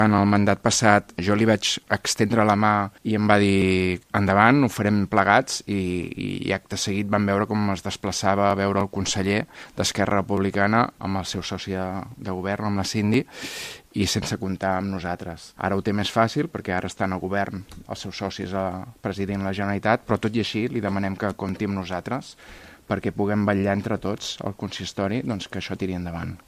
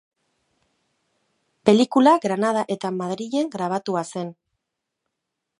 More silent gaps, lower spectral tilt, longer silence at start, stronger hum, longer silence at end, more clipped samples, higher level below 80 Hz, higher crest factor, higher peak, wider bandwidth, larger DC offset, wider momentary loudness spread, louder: neither; about the same, -5 dB/octave vs -5.5 dB/octave; second, 0 s vs 1.65 s; neither; second, 0.1 s vs 1.25 s; neither; first, -54 dBFS vs -72 dBFS; about the same, 22 dB vs 22 dB; about the same, 0 dBFS vs -2 dBFS; first, 15 kHz vs 11 kHz; neither; about the same, 12 LU vs 12 LU; second, -24 LUFS vs -21 LUFS